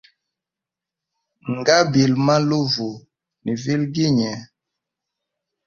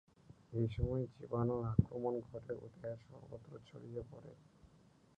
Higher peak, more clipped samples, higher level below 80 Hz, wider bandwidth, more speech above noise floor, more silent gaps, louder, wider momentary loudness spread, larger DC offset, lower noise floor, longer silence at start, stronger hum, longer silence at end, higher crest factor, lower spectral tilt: first, 0 dBFS vs -16 dBFS; neither; about the same, -58 dBFS vs -54 dBFS; about the same, 7.2 kHz vs 6.8 kHz; first, 69 dB vs 26 dB; neither; first, -19 LUFS vs -41 LUFS; second, 15 LU vs 18 LU; neither; first, -87 dBFS vs -67 dBFS; first, 1.45 s vs 0.3 s; neither; first, 1.2 s vs 0.5 s; about the same, 22 dB vs 26 dB; second, -5.5 dB/octave vs -10.5 dB/octave